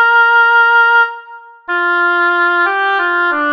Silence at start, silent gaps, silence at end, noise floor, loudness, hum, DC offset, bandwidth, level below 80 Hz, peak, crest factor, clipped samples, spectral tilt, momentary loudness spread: 0 s; none; 0 s; -35 dBFS; -11 LUFS; none; under 0.1%; 6.4 kHz; -68 dBFS; -2 dBFS; 10 dB; under 0.1%; -2 dB/octave; 9 LU